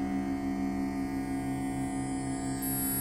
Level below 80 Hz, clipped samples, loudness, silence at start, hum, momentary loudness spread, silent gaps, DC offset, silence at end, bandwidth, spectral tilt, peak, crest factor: -48 dBFS; under 0.1%; -33 LUFS; 0 s; none; 3 LU; none; under 0.1%; 0 s; 16 kHz; -5 dB/octave; -20 dBFS; 12 dB